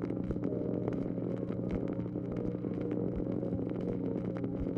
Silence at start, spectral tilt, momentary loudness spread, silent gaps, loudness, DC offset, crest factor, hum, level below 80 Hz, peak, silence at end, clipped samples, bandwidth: 0 s; -11 dB/octave; 2 LU; none; -36 LUFS; under 0.1%; 16 dB; none; -52 dBFS; -18 dBFS; 0 s; under 0.1%; 6 kHz